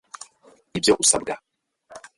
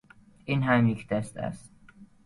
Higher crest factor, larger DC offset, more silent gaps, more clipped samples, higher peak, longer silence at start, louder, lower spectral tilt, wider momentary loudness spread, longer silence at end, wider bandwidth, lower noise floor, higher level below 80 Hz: about the same, 20 dB vs 18 dB; neither; neither; neither; first, -4 dBFS vs -10 dBFS; first, 0.75 s vs 0.45 s; first, -19 LUFS vs -27 LUFS; second, -2 dB/octave vs -7.5 dB/octave; first, 24 LU vs 18 LU; about the same, 0.2 s vs 0.2 s; about the same, 12 kHz vs 11.5 kHz; about the same, -56 dBFS vs -53 dBFS; about the same, -56 dBFS vs -58 dBFS